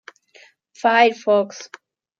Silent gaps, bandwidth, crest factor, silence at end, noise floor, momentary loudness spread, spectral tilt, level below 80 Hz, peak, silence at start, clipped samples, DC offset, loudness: none; 7.6 kHz; 20 dB; 0.55 s; -52 dBFS; 21 LU; -3.5 dB/octave; -82 dBFS; -2 dBFS; 0.85 s; under 0.1%; under 0.1%; -18 LUFS